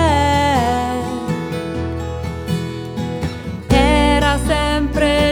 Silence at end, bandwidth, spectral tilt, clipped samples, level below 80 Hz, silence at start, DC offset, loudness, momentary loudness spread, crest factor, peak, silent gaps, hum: 0 s; 17.5 kHz; -5.5 dB/octave; under 0.1%; -26 dBFS; 0 s; under 0.1%; -18 LUFS; 11 LU; 16 dB; -2 dBFS; none; none